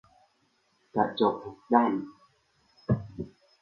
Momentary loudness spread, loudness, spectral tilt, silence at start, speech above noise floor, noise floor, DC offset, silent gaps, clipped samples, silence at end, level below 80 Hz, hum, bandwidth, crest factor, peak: 18 LU; -28 LUFS; -9 dB/octave; 0.95 s; 44 dB; -71 dBFS; under 0.1%; none; under 0.1%; 0.35 s; -58 dBFS; none; 5.6 kHz; 24 dB; -6 dBFS